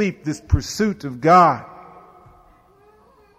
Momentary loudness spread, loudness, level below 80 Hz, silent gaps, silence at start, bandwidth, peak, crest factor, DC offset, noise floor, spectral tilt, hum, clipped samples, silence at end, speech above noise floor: 16 LU; -18 LUFS; -36 dBFS; none; 0 s; 15 kHz; -4 dBFS; 18 dB; under 0.1%; -53 dBFS; -6 dB/octave; none; under 0.1%; 1.65 s; 35 dB